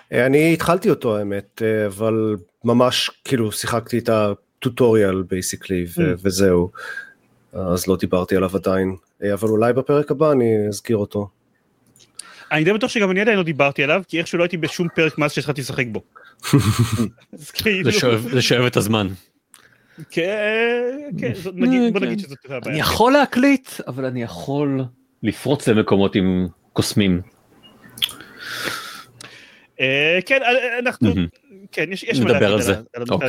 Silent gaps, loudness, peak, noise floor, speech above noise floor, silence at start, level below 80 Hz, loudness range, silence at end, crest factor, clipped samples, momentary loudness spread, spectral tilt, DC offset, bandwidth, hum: none; -19 LUFS; 0 dBFS; -63 dBFS; 44 dB; 0.1 s; -50 dBFS; 3 LU; 0 s; 20 dB; under 0.1%; 12 LU; -5 dB/octave; under 0.1%; 17 kHz; none